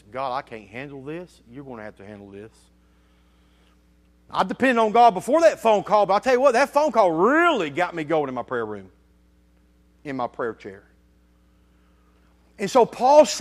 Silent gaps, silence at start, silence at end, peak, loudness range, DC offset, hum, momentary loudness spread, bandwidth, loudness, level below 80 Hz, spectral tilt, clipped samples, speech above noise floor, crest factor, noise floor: none; 0.15 s; 0 s; -4 dBFS; 18 LU; under 0.1%; none; 23 LU; 14.5 kHz; -20 LUFS; -60 dBFS; -4.5 dB/octave; under 0.1%; 37 dB; 20 dB; -58 dBFS